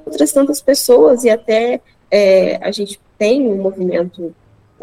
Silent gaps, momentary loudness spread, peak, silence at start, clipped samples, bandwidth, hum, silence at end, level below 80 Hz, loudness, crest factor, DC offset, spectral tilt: none; 14 LU; 0 dBFS; 0.05 s; under 0.1%; 16.5 kHz; none; 0.5 s; -54 dBFS; -14 LUFS; 14 dB; under 0.1%; -4 dB/octave